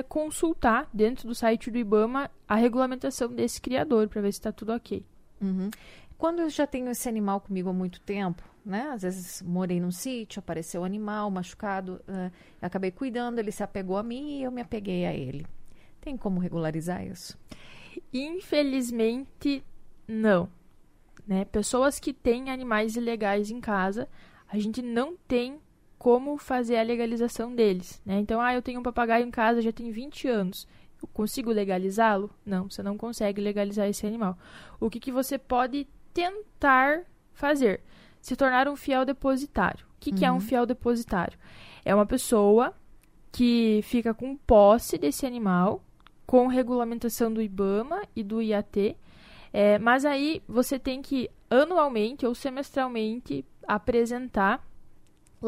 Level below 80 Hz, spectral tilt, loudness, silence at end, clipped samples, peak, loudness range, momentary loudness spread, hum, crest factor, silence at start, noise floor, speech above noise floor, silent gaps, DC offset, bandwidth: -50 dBFS; -5.5 dB/octave; -27 LUFS; 0 s; under 0.1%; -8 dBFS; 8 LU; 12 LU; none; 20 dB; 0 s; -55 dBFS; 29 dB; none; under 0.1%; 16 kHz